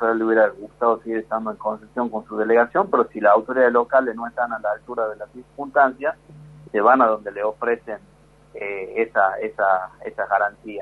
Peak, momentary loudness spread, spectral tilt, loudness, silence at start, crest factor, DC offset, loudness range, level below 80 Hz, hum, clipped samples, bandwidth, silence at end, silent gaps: -2 dBFS; 12 LU; -7.5 dB/octave; -21 LUFS; 0 s; 18 dB; under 0.1%; 4 LU; -60 dBFS; none; under 0.1%; 4.6 kHz; 0 s; none